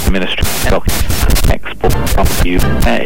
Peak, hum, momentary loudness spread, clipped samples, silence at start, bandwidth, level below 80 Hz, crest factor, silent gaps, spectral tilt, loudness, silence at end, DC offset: 0 dBFS; none; 3 LU; under 0.1%; 0 s; 17.5 kHz; -16 dBFS; 8 dB; none; -4.5 dB/octave; -14 LUFS; 0 s; 20%